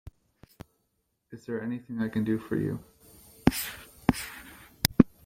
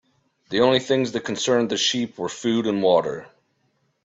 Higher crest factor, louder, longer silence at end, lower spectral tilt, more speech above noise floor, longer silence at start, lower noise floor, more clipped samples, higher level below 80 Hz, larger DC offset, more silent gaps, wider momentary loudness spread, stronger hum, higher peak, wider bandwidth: first, 30 dB vs 18 dB; second, -30 LUFS vs -22 LUFS; second, 0.2 s vs 0.75 s; about the same, -5 dB/octave vs -4 dB/octave; about the same, 46 dB vs 47 dB; second, 0.05 s vs 0.5 s; first, -77 dBFS vs -68 dBFS; neither; first, -48 dBFS vs -64 dBFS; neither; neither; first, 17 LU vs 9 LU; neither; first, 0 dBFS vs -4 dBFS; first, 16.5 kHz vs 8.2 kHz